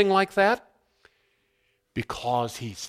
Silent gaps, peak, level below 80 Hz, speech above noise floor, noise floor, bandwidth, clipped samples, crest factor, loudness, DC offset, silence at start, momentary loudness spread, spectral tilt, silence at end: none; -8 dBFS; -58 dBFS; 47 dB; -71 dBFS; 15.5 kHz; under 0.1%; 20 dB; -26 LUFS; under 0.1%; 0 s; 13 LU; -4.5 dB/octave; 0 s